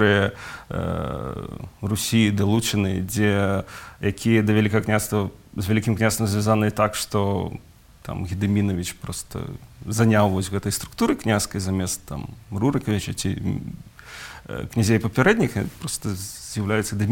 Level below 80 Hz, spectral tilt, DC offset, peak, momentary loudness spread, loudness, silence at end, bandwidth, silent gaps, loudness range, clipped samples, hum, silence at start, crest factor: -46 dBFS; -5.5 dB/octave; under 0.1%; -4 dBFS; 15 LU; -23 LUFS; 0 s; 17 kHz; none; 4 LU; under 0.1%; none; 0 s; 18 dB